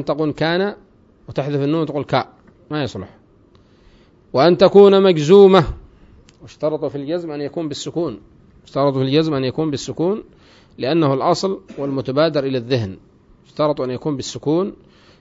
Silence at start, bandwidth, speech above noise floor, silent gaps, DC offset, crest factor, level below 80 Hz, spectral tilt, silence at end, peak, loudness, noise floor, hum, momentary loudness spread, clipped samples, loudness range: 0 s; 7.8 kHz; 34 dB; none; under 0.1%; 18 dB; -46 dBFS; -6.5 dB/octave; 0.5 s; 0 dBFS; -17 LUFS; -51 dBFS; none; 16 LU; under 0.1%; 10 LU